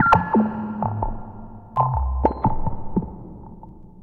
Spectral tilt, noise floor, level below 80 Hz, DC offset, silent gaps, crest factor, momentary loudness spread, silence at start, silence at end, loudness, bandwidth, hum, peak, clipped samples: -9 dB/octave; -41 dBFS; -30 dBFS; under 0.1%; none; 22 dB; 20 LU; 0 s; 0 s; -23 LUFS; 7.4 kHz; none; 0 dBFS; under 0.1%